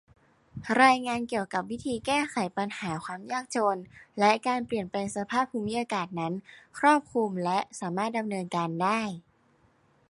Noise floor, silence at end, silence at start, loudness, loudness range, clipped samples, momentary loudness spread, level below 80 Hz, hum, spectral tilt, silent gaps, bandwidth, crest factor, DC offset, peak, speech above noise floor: -65 dBFS; 0.9 s; 0.55 s; -28 LUFS; 2 LU; under 0.1%; 11 LU; -66 dBFS; none; -4.5 dB/octave; none; 11.5 kHz; 22 dB; under 0.1%; -6 dBFS; 37 dB